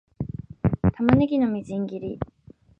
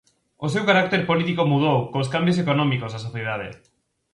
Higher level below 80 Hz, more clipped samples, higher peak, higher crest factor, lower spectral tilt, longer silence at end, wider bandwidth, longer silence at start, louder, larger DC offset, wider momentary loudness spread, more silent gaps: first, -42 dBFS vs -58 dBFS; neither; about the same, -2 dBFS vs -4 dBFS; first, 24 dB vs 18 dB; first, -9.5 dB/octave vs -6.5 dB/octave; about the same, 0.55 s vs 0.6 s; second, 7.6 kHz vs 11.5 kHz; second, 0.2 s vs 0.4 s; about the same, -24 LUFS vs -22 LUFS; neither; first, 15 LU vs 12 LU; neither